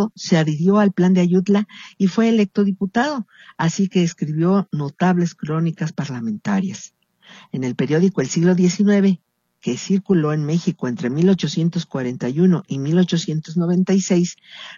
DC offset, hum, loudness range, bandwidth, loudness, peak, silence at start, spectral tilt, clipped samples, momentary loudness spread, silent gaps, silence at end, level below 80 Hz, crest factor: under 0.1%; none; 4 LU; 7.4 kHz; -19 LUFS; -4 dBFS; 0 s; -6.5 dB/octave; under 0.1%; 10 LU; none; 0 s; -64 dBFS; 16 dB